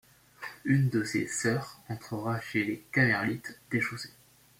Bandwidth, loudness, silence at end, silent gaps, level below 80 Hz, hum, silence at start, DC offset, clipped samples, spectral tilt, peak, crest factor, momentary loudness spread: 16.5 kHz; -30 LUFS; 0.5 s; none; -66 dBFS; none; 0.4 s; under 0.1%; under 0.1%; -5.5 dB/octave; -12 dBFS; 20 dB; 16 LU